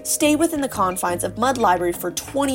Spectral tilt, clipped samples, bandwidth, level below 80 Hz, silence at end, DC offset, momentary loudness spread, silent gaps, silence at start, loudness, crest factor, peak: -3.5 dB/octave; under 0.1%; 16.5 kHz; -48 dBFS; 0 s; under 0.1%; 6 LU; none; 0 s; -20 LUFS; 16 dB; -4 dBFS